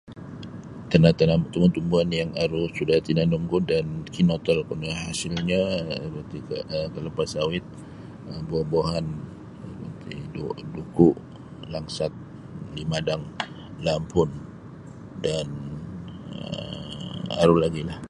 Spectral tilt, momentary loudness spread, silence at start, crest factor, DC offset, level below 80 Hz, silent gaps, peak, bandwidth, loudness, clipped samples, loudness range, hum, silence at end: -6.5 dB/octave; 19 LU; 0.05 s; 24 dB; under 0.1%; -46 dBFS; none; -2 dBFS; 11.5 kHz; -25 LUFS; under 0.1%; 7 LU; none; 0 s